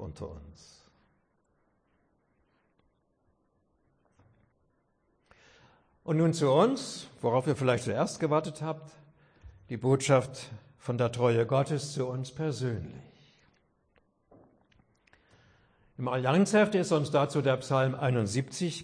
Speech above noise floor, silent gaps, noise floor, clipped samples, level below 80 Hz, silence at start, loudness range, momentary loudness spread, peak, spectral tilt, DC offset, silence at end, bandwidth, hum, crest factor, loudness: 44 dB; none; -73 dBFS; under 0.1%; -64 dBFS; 0 s; 11 LU; 17 LU; -12 dBFS; -6 dB/octave; under 0.1%; 0 s; 10.5 kHz; none; 20 dB; -29 LUFS